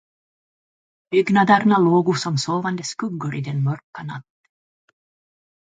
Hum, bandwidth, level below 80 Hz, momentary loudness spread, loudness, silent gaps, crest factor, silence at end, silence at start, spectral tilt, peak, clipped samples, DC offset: none; 9.4 kHz; -66 dBFS; 17 LU; -19 LUFS; 3.84-3.93 s; 20 dB; 1.45 s; 1.1 s; -6 dB/octave; 0 dBFS; under 0.1%; under 0.1%